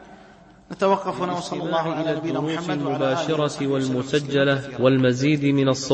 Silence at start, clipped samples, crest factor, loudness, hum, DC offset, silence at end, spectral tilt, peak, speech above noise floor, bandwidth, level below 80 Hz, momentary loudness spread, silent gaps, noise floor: 0 s; under 0.1%; 18 dB; -22 LUFS; none; under 0.1%; 0 s; -6 dB/octave; -4 dBFS; 27 dB; 8.8 kHz; -58 dBFS; 6 LU; none; -49 dBFS